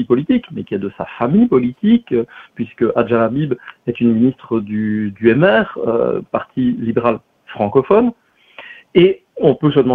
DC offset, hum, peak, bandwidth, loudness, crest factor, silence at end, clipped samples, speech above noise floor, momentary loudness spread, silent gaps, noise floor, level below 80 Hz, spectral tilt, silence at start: under 0.1%; none; 0 dBFS; 4 kHz; -16 LUFS; 16 dB; 0 s; under 0.1%; 25 dB; 11 LU; none; -40 dBFS; -50 dBFS; -10 dB/octave; 0 s